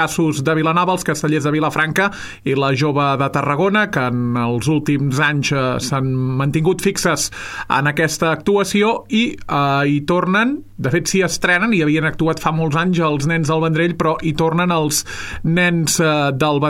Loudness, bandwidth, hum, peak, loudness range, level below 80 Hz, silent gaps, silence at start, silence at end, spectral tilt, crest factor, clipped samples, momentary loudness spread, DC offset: -17 LUFS; 16 kHz; none; -2 dBFS; 1 LU; -44 dBFS; none; 0 s; 0 s; -5 dB/octave; 14 dB; under 0.1%; 4 LU; under 0.1%